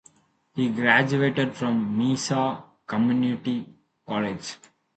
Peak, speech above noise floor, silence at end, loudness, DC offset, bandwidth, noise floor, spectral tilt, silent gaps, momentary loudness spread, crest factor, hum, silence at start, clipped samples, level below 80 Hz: -4 dBFS; 35 dB; 0.4 s; -24 LUFS; under 0.1%; 9 kHz; -59 dBFS; -5.5 dB/octave; none; 16 LU; 20 dB; none; 0.55 s; under 0.1%; -64 dBFS